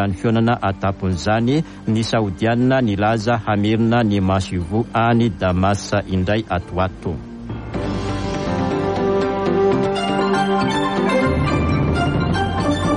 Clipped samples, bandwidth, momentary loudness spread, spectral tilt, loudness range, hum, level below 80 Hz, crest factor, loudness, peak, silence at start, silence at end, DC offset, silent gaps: under 0.1%; 11 kHz; 6 LU; -6.5 dB/octave; 4 LU; none; -36 dBFS; 14 dB; -19 LUFS; -4 dBFS; 0 s; 0 s; under 0.1%; none